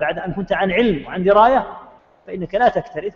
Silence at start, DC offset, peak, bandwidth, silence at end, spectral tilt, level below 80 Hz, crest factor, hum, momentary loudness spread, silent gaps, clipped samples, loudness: 0 s; under 0.1%; -2 dBFS; 6.8 kHz; 0.05 s; -7.5 dB/octave; -44 dBFS; 16 dB; none; 15 LU; none; under 0.1%; -17 LUFS